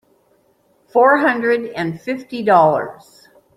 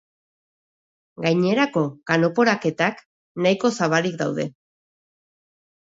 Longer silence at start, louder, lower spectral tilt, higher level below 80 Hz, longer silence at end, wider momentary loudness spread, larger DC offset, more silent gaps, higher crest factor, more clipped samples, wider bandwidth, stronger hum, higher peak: second, 0.95 s vs 1.2 s; first, -16 LUFS vs -21 LUFS; first, -7 dB/octave vs -5.5 dB/octave; first, -62 dBFS vs -68 dBFS; second, 0.65 s vs 1.35 s; first, 12 LU vs 7 LU; neither; second, none vs 3.06-3.35 s; about the same, 16 dB vs 20 dB; neither; first, 13 kHz vs 7.8 kHz; neither; about the same, -2 dBFS vs -4 dBFS